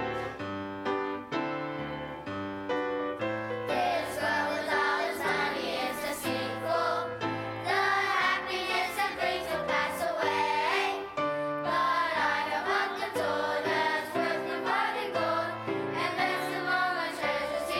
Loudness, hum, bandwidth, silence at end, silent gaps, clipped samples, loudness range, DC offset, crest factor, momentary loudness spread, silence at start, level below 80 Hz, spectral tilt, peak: -30 LUFS; none; 16.5 kHz; 0 s; none; under 0.1%; 3 LU; under 0.1%; 16 dB; 7 LU; 0 s; -64 dBFS; -4 dB/octave; -14 dBFS